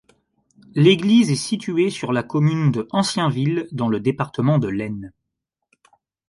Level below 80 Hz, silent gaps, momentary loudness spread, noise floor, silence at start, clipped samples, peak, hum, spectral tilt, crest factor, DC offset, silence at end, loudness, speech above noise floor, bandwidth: -58 dBFS; none; 9 LU; -80 dBFS; 0.75 s; under 0.1%; -2 dBFS; none; -6 dB/octave; 18 dB; under 0.1%; 1.2 s; -20 LUFS; 61 dB; 11.5 kHz